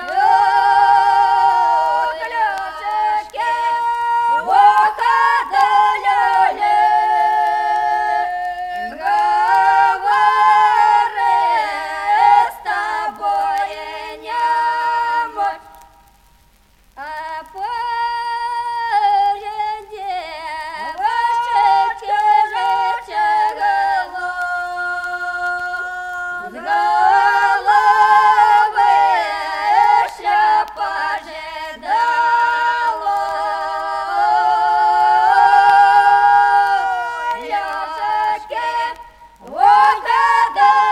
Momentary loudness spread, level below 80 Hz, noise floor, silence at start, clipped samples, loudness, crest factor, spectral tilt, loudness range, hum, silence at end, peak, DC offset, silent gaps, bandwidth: 13 LU; -54 dBFS; -52 dBFS; 0 s; under 0.1%; -15 LUFS; 14 dB; -1.5 dB/octave; 7 LU; none; 0 s; -2 dBFS; under 0.1%; none; 13 kHz